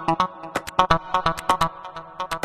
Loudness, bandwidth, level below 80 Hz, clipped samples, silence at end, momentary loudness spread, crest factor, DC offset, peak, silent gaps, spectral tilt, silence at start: -23 LUFS; 14 kHz; -42 dBFS; under 0.1%; 0 s; 13 LU; 22 dB; under 0.1%; -2 dBFS; none; -4 dB/octave; 0 s